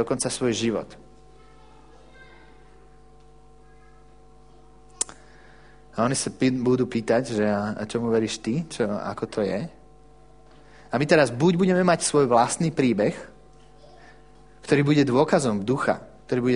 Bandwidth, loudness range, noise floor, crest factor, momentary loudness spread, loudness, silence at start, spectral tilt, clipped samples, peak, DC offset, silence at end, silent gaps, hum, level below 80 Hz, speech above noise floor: 10.5 kHz; 12 LU; -52 dBFS; 22 dB; 11 LU; -23 LUFS; 0 s; -5 dB/octave; under 0.1%; -4 dBFS; 0.2%; 0 s; none; none; -54 dBFS; 30 dB